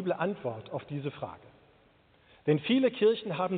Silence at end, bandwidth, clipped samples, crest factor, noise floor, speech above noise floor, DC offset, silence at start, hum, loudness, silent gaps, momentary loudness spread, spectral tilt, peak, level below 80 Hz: 0 s; 4.6 kHz; under 0.1%; 18 dB; -63 dBFS; 34 dB; under 0.1%; 0 s; none; -30 LUFS; none; 14 LU; -5 dB/octave; -12 dBFS; -70 dBFS